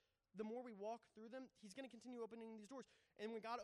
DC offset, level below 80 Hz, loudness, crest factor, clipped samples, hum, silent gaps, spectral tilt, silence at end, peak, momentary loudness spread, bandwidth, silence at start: under 0.1%; under -90 dBFS; -55 LUFS; 18 dB; under 0.1%; none; none; -5 dB/octave; 0 s; -36 dBFS; 8 LU; 12 kHz; 0.35 s